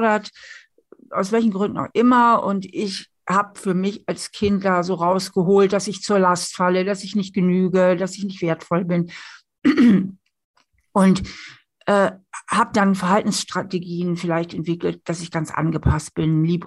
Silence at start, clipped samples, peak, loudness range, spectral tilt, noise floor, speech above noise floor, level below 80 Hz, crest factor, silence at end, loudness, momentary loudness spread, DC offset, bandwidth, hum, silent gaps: 0 s; under 0.1%; -4 dBFS; 3 LU; -6 dB/octave; -51 dBFS; 31 dB; -44 dBFS; 16 dB; 0 s; -20 LUFS; 10 LU; under 0.1%; 12 kHz; none; 10.45-10.54 s